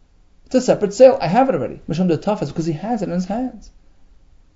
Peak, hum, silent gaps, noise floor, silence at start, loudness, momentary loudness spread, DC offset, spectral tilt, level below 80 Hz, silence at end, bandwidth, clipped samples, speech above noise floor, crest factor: 0 dBFS; none; none; -50 dBFS; 0.5 s; -18 LUFS; 12 LU; under 0.1%; -6.5 dB/octave; -46 dBFS; 0.85 s; 7.8 kHz; under 0.1%; 33 dB; 18 dB